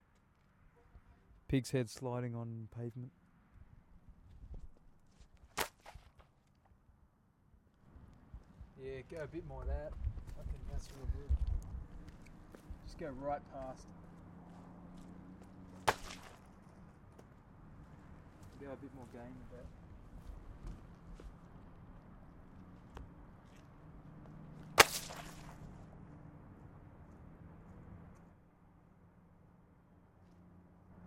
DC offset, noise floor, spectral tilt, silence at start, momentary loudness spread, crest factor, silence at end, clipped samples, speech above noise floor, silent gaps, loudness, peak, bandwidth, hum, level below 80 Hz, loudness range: under 0.1%; -70 dBFS; -3.5 dB/octave; 0.6 s; 21 LU; 42 dB; 0 s; under 0.1%; 28 dB; none; -40 LUFS; -4 dBFS; 16 kHz; none; -52 dBFS; 21 LU